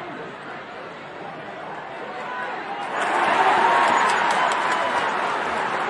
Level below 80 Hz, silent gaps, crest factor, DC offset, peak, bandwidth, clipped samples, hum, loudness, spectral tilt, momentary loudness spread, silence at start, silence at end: -66 dBFS; none; 18 dB; under 0.1%; -6 dBFS; 11.5 kHz; under 0.1%; none; -21 LUFS; -2.5 dB/octave; 17 LU; 0 s; 0 s